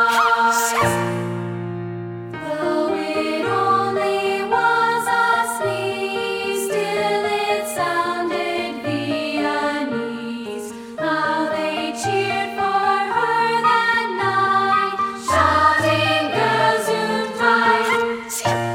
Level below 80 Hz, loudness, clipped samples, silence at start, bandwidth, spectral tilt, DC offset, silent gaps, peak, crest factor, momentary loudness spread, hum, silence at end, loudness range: -54 dBFS; -19 LUFS; under 0.1%; 0 s; 19 kHz; -4 dB/octave; under 0.1%; none; -2 dBFS; 16 dB; 10 LU; none; 0 s; 5 LU